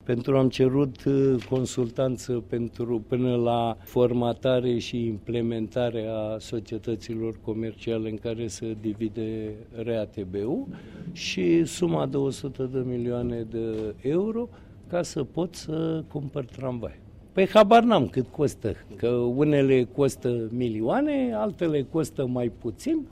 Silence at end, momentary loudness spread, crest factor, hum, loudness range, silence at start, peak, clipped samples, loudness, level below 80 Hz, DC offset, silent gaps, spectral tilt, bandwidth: 0 s; 10 LU; 20 dB; none; 8 LU; 0.05 s; -6 dBFS; under 0.1%; -26 LUFS; -52 dBFS; under 0.1%; none; -6.5 dB/octave; 15 kHz